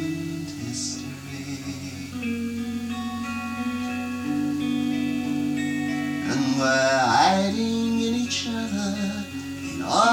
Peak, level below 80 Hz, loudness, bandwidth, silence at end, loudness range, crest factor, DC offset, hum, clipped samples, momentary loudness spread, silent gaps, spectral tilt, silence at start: -8 dBFS; -58 dBFS; -25 LUFS; 17.5 kHz; 0 s; 8 LU; 18 dB; under 0.1%; none; under 0.1%; 13 LU; none; -4 dB/octave; 0 s